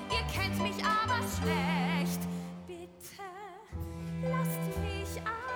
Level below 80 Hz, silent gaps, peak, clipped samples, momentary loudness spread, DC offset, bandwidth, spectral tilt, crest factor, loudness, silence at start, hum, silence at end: -48 dBFS; none; -18 dBFS; under 0.1%; 15 LU; under 0.1%; over 20 kHz; -5 dB/octave; 16 dB; -33 LUFS; 0 s; none; 0 s